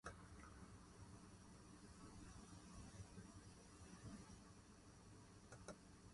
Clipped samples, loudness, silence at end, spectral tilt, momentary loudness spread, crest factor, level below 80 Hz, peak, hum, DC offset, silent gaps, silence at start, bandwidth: under 0.1%; -62 LUFS; 0 s; -4.5 dB/octave; 5 LU; 20 dB; -70 dBFS; -40 dBFS; none; under 0.1%; none; 0.05 s; 11.5 kHz